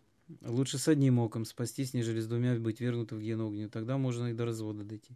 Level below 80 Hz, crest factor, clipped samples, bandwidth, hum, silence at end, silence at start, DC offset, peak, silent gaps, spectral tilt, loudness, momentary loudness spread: -70 dBFS; 18 dB; under 0.1%; 14 kHz; none; 0 s; 0.3 s; under 0.1%; -16 dBFS; none; -6.5 dB/octave; -33 LUFS; 10 LU